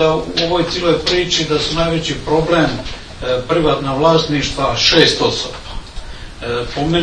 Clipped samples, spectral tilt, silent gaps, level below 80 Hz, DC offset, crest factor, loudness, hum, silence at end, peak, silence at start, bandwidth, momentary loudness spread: under 0.1%; -4.5 dB/octave; none; -32 dBFS; under 0.1%; 16 dB; -15 LUFS; none; 0 s; 0 dBFS; 0 s; 11 kHz; 17 LU